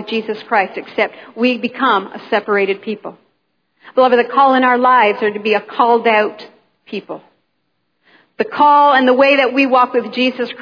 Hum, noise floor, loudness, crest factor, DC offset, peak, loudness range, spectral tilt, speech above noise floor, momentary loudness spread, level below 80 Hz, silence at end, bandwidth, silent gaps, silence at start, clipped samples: none; -69 dBFS; -14 LUFS; 14 dB; under 0.1%; 0 dBFS; 5 LU; -6 dB/octave; 55 dB; 14 LU; -70 dBFS; 0 s; 5.2 kHz; none; 0 s; under 0.1%